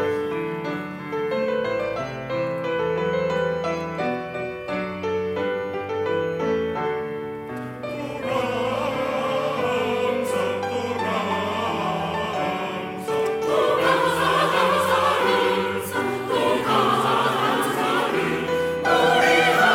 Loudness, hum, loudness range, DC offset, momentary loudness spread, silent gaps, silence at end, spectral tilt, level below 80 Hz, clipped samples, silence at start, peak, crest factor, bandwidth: -23 LUFS; none; 6 LU; under 0.1%; 9 LU; none; 0 s; -4.5 dB/octave; -58 dBFS; under 0.1%; 0 s; -6 dBFS; 16 dB; 17 kHz